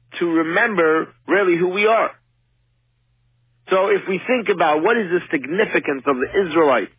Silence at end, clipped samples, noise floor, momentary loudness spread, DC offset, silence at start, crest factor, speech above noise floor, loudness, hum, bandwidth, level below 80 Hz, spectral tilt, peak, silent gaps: 0.1 s; under 0.1%; -64 dBFS; 5 LU; under 0.1%; 0.1 s; 14 dB; 46 dB; -18 LUFS; none; 3.8 kHz; -60 dBFS; -9 dB/octave; -4 dBFS; none